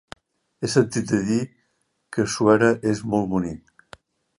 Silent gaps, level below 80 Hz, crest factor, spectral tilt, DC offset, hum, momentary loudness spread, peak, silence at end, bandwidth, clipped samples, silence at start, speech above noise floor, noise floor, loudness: none; -54 dBFS; 20 dB; -5.5 dB/octave; under 0.1%; none; 14 LU; -2 dBFS; 0.8 s; 11.5 kHz; under 0.1%; 0.6 s; 50 dB; -71 dBFS; -22 LUFS